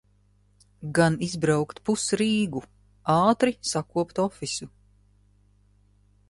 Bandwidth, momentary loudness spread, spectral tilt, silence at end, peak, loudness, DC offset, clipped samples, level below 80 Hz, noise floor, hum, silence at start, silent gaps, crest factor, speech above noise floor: 11.5 kHz; 12 LU; -5 dB/octave; 1.6 s; -6 dBFS; -25 LUFS; under 0.1%; under 0.1%; -58 dBFS; -62 dBFS; 50 Hz at -50 dBFS; 0.8 s; none; 20 dB; 38 dB